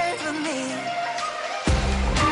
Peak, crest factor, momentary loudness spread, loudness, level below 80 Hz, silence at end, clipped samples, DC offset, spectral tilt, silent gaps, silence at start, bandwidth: -12 dBFS; 12 dB; 5 LU; -25 LUFS; -30 dBFS; 0 s; under 0.1%; under 0.1%; -4.5 dB/octave; none; 0 s; 11 kHz